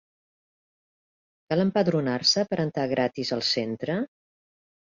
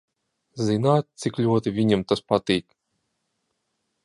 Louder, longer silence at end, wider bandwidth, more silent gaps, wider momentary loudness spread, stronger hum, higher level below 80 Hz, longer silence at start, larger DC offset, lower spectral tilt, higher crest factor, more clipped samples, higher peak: about the same, -25 LUFS vs -23 LUFS; second, 0.8 s vs 1.45 s; second, 7.6 kHz vs 11.5 kHz; neither; first, 8 LU vs 5 LU; neither; second, -66 dBFS vs -56 dBFS; first, 1.5 s vs 0.55 s; neither; second, -4.5 dB/octave vs -6.5 dB/octave; about the same, 20 dB vs 20 dB; neither; second, -8 dBFS vs -4 dBFS